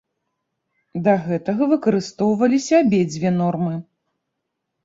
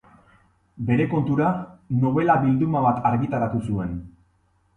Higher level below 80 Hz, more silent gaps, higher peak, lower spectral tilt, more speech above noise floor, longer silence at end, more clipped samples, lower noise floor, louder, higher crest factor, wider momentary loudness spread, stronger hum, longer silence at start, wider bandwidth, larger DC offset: second, -60 dBFS vs -48 dBFS; neither; about the same, -4 dBFS vs -6 dBFS; second, -7 dB/octave vs -10 dB/octave; first, 60 dB vs 42 dB; first, 1.05 s vs 0.65 s; neither; first, -78 dBFS vs -64 dBFS; first, -19 LUFS vs -22 LUFS; about the same, 16 dB vs 18 dB; second, 8 LU vs 11 LU; neither; first, 0.95 s vs 0.75 s; second, 7.8 kHz vs 9.6 kHz; neither